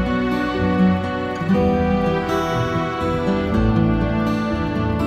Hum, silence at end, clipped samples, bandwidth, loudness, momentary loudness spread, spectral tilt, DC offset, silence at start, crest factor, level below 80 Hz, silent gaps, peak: none; 0 s; under 0.1%; 13.5 kHz; -20 LUFS; 4 LU; -7.5 dB/octave; under 0.1%; 0 s; 14 dB; -32 dBFS; none; -4 dBFS